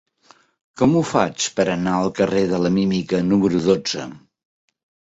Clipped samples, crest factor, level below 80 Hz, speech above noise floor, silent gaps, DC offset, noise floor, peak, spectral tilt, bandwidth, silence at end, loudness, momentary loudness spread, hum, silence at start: under 0.1%; 18 dB; -52 dBFS; 36 dB; none; under 0.1%; -55 dBFS; -2 dBFS; -5.5 dB/octave; 8 kHz; 0.9 s; -19 LUFS; 4 LU; none; 0.75 s